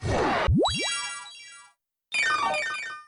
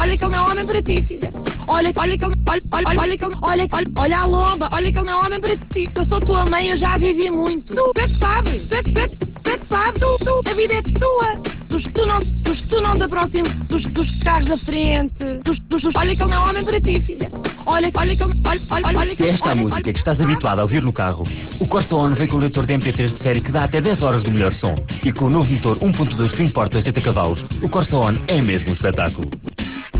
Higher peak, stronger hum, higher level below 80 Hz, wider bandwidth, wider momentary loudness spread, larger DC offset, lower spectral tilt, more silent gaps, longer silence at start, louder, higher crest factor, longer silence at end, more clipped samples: second, -16 dBFS vs -6 dBFS; neither; second, -40 dBFS vs -26 dBFS; first, 11 kHz vs 4 kHz; first, 17 LU vs 5 LU; neither; second, -4 dB/octave vs -11 dB/octave; neither; about the same, 0 s vs 0 s; second, -25 LUFS vs -19 LUFS; about the same, 12 dB vs 12 dB; about the same, 0.05 s vs 0 s; neither